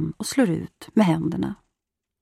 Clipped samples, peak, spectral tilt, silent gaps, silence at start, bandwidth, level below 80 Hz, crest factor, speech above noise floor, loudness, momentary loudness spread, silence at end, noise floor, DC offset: under 0.1%; -8 dBFS; -6 dB/octave; none; 0 s; 15 kHz; -56 dBFS; 18 dB; 61 dB; -23 LUFS; 10 LU; 0.65 s; -84 dBFS; under 0.1%